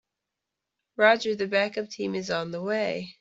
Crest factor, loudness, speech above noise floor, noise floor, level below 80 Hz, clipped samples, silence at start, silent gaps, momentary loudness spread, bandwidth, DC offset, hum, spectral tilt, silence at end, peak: 22 dB; -26 LUFS; 60 dB; -86 dBFS; -72 dBFS; under 0.1%; 1 s; none; 10 LU; 7.8 kHz; under 0.1%; none; -4.5 dB/octave; 0.1 s; -6 dBFS